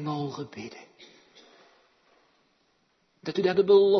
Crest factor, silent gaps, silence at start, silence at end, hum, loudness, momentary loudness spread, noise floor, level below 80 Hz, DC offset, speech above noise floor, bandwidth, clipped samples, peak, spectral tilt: 20 dB; none; 0 s; 0 s; none; -26 LUFS; 23 LU; -70 dBFS; -76 dBFS; under 0.1%; 45 dB; 6.4 kHz; under 0.1%; -8 dBFS; -6.5 dB/octave